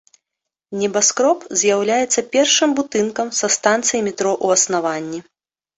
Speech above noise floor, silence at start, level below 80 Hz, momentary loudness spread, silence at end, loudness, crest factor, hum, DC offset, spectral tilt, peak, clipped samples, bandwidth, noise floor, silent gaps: 65 dB; 0.7 s; -64 dBFS; 9 LU; 0.55 s; -17 LUFS; 16 dB; none; under 0.1%; -2 dB/octave; -2 dBFS; under 0.1%; 8.4 kHz; -83 dBFS; none